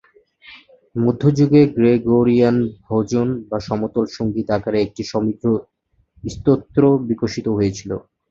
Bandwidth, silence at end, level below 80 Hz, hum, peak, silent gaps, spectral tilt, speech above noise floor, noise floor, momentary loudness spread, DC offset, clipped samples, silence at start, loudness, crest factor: 7.6 kHz; 0.3 s; -46 dBFS; none; -2 dBFS; none; -8 dB/octave; 40 dB; -57 dBFS; 10 LU; under 0.1%; under 0.1%; 0.5 s; -18 LUFS; 16 dB